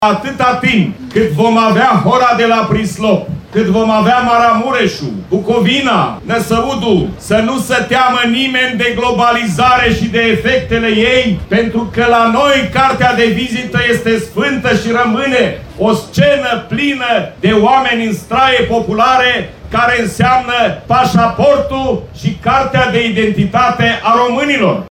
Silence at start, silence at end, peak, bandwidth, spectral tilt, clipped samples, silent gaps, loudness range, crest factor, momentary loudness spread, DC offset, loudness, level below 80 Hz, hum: 0 s; 0 s; 0 dBFS; 17 kHz; -5.5 dB/octave; under 0.1%; none; 2 LU; 12 dB; 6 LU; under 0.1%; -11 LUFS; -36 dBFS; none